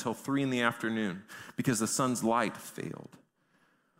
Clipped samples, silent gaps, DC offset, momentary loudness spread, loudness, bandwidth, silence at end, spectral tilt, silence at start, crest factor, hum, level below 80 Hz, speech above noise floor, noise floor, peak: under 0.1%; none; under 0.1%; 13 LU; -32 LUFS; 16 kHz; 0.95 s; -4.5 dB/octave; 0 s; 22 dB; none; -72 dBFS; 38 dB; -70 dBFS; -10 dBFS